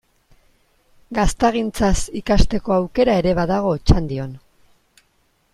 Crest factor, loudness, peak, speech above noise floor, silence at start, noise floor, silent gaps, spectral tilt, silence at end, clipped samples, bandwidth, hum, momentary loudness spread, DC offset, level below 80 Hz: 18 dB; -19 LUFS; -2 dBFS; 45 dB; 1.1 s; -63 dBFS; none; -6 dB/octave; 1.15 s; under 0.1%; 12.5 kHz; none; 8 LU; under 0.1%; -28 dBFS